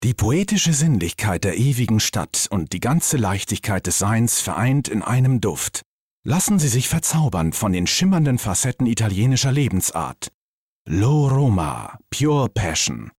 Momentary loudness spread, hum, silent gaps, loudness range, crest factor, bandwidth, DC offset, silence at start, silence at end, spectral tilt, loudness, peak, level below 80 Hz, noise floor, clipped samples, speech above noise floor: 6 LU; none; 5.86-6.23 s, 10.34-10.85 s; 2 LU; 10 dB; 16.5 kHz; under 0.1%; 0 s; 0.1 s; -4.5 dB/octave; -19 LUFS; -10 dBFS; -44 dBFS; -51 dBFS; under 0.1%; 32 dB